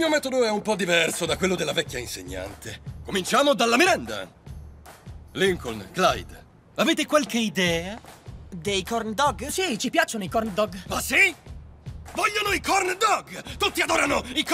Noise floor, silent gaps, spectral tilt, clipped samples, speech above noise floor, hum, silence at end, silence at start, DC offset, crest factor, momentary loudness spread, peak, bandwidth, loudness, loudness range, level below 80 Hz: -44 dBFS; none; -3 dB/octave; under 0.1%; 20 dB; none; 0 s; 0 s; under 0.1%; 20 dB; 19 LU; -4 dBFS; 16 kHz; -23 LUFS; 2 LU; -46 dBFS